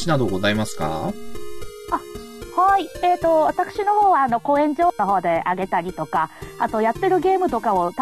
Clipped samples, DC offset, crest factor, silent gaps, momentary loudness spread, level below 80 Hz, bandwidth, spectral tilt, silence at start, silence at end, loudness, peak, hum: under 0.1%; under 0.1%; 16 dB; none; 11 LU; -46 dBFS; 13.5 kHz; -5.5 dB/octave; 0 s; 0 s; -20 LUFS; -4 dBFS; none